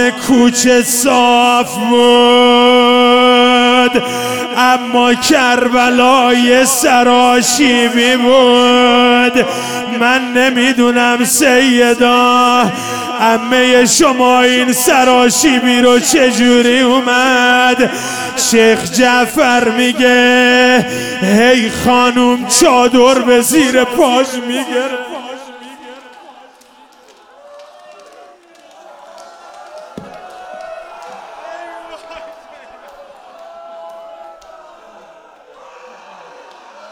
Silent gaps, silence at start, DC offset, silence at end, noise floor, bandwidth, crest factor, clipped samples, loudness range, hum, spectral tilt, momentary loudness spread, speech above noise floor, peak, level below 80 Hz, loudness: none; 0 s; under 0.1%; 0.05 s; -43 dBFS; 19 kHz; 12 dB; under 0.1%; 6 LU; none; -2.5 dB/octave; 10 LU; 34 dB; 0 dBFS; -48 dBFS; -9 LUFS